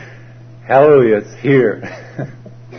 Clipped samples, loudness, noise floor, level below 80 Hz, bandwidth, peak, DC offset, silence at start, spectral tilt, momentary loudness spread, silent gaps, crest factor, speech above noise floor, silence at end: under 0.1%; -12 LUFS; -37 dBFS; -54 dBFS; 6.4 kHz; 0 dBFS; under 0.1%; 0 s; -8.5 dB/octave; 19 LU; none; 14 dB; 24 dB; 0 s